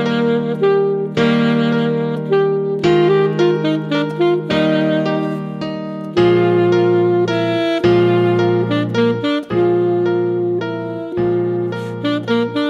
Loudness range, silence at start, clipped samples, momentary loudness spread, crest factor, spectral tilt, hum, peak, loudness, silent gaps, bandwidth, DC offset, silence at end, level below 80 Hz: 3 LU; 0 s; under 0.1%; 8 LU; 12 dB; -7.5 dB/octave; none; -2 dBFS; -16 LUFS; none; 7.4 kHz; under 0.1%; 0 s; -52 dBFS